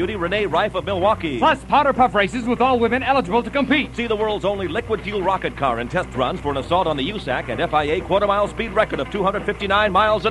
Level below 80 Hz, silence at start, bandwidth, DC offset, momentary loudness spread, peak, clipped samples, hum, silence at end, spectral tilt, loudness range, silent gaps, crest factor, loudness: -38 dBFS; 0 s; 11.5 kHz; under 0.1%; 6 LU; -2 dBFS; under 0.1%; none; 0 s; -6 dB/octave; 4 LU; none; 18 dB; -20 LUFS